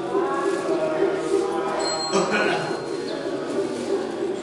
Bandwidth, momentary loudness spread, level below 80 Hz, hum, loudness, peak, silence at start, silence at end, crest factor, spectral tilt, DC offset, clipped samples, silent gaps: 11.5 kHz; 7 LU; -62 dBFS; none; -24 LUFS; -8 dBFS; 0 s; 0 s; 16 dB; -4 dB/octave; under 0.1%; under 0.1%; none